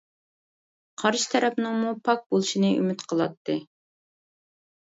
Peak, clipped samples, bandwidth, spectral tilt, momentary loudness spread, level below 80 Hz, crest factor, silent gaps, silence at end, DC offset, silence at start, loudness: -8 dBFS; under 0.1%; 8 kHz; -4.5 dB/octave; 8 LU; -74 dBFS; 20 dB; 2.26-2.30 s, 3.37-3.45 s; 1.25 s; under 0.1%; 1 s; -25 LUFS